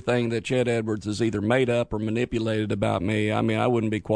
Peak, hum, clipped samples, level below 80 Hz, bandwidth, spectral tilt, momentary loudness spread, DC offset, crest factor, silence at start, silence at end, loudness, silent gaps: -6 dBFS; none; under 0.1%; -50 dBFS; 10.5 kHz; -6.5 dB/octave; 4 LU; under 0.1%; 18 dB; 0 s; 0 s; -25 LUFS; none